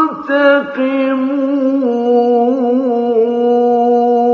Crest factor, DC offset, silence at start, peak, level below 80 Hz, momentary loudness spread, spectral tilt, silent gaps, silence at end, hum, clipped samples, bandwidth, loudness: 12 dB; under 0.1%; 0 s; 0 dBFS; -64 dBFS; 4 LU; -7 dB/octave; none; 0 s; none; under 0.1%; 6.4 kHz; -13 LUFS